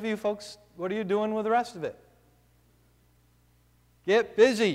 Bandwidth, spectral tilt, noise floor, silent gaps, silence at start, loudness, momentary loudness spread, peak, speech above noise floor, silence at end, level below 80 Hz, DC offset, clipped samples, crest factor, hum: 13.5 kHz; -5 dB/octave; -63 dBFS; none; 0 s; -27 LUFS; 16 LU; -10 dBFS; 37 dB; 0 s; -66 dBFS; under 0.1%; under 0.1%; 20 dB; 60 Hz at -65 dBFS